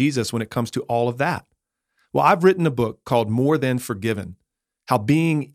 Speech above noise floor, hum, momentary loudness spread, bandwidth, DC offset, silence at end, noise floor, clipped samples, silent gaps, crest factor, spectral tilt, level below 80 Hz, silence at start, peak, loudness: 51 dB; none; 9 LU; 16 kHz; under 0.1%; 0.1 s; -71 dBFS; under 0.1%; none; 18 dB; -6.5 dB/octave; -58 dBFS; 0 s; -4 dBFS; -21 LUFS